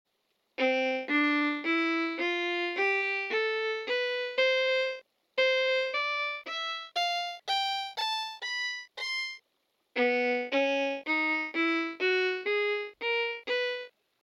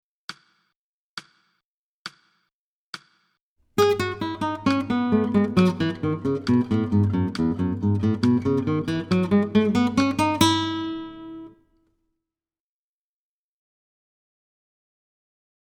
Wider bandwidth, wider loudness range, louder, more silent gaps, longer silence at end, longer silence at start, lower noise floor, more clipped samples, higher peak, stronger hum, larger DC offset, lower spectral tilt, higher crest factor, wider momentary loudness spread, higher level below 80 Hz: second, 14.5 kHz vs 19 kHz; second, 3 LU vs 9 LU; second, -29 LUFS vs -22 LUFS; second, none vs 0.76-1.17 s, 1.64-2.05 s, 2.53-2.93 s, 3.41-3.56 s; second, 0.4 s vs 4.15 s; first, 0.6 s vs 0.3 s; second, -77 dBFS vs under -90 dBFS; neither; second, -16 dBFS vs -2 dBFS; neither; neither; second, -1 dB/octave vs -6 dB/octave; second, 16 dB vs 24 dB; second, 7 LU vs 20 LU; second, -84 dBFS vs -54 dBFS